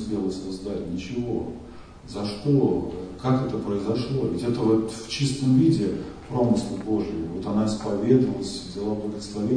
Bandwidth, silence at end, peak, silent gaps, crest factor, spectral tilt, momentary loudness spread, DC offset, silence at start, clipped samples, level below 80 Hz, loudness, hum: 10 kHz; 0 s; -6 dBFS; none; 18 dB; -7 dB/octave; 11 LU; 0.1%; 0 s; under 0.1%; -48 dBFS; -25 LUFS; none